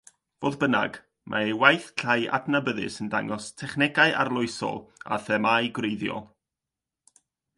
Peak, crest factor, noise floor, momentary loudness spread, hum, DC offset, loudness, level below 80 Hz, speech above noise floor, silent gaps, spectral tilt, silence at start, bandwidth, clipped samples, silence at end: -2 dBFS; 26 dB; -88 dBFS; 12 LU; none; under 0.1%; -25 LUFS; -66 dBFS; 63 dB; none; -4.5 dB/octave; 0.4 s; 11.5 kHz; under 0.1%; 1.35 s